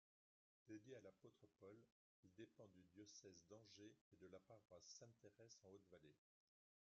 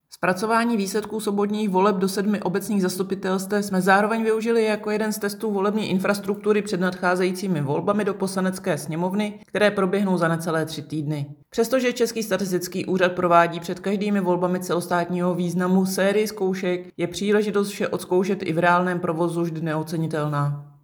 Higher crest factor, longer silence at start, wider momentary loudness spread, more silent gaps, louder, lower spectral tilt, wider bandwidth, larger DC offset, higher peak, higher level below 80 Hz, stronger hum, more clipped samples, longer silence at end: about the same, 18 dB vs 20 dB; first, 0.65 s vs 0.1 s; about the same, 5 LU vs 7 LU; first, 1.92-2.23 s, 4.01-4.11 s vs none; second, -66 LUFS vs -23 LUFS; about the same, -5 dB/octave vs -5.5 dB/octave; second, 7.2 kHz vs over 20 kHz; neither; second, -50 dBFS vs -2 dBFS; second, under -90 dBFS vs -66 dBFS; neither; neither; first, 0.75 s vs 0.15 s